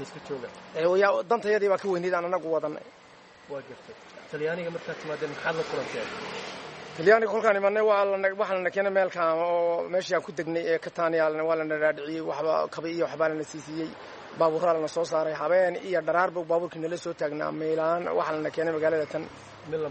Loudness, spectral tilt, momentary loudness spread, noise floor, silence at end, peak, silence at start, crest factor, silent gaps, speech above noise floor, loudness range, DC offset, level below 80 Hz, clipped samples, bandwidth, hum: -27 LUFS; -5 dB/octave; 14 LU; -52 dBFS; 0 s; -6 dBFS; 0 s; 20 dB; none; 25 dB; 8 LU; under 0.1%; -70 dBFS; under 0.1%; 8.4 kHz; none